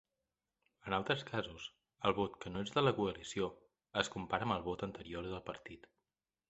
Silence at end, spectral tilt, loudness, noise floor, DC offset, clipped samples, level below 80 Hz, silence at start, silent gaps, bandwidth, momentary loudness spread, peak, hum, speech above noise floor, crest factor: 0.7 s; -5 dB/octave; -39 LUFS; under -90 dBFS; under 0.1%; under 0.1%; -64 dBFS; 0.85 s; none; 8.2 kHz; 16 LU; -14 dBFS; none; over 51 dB; 26 dB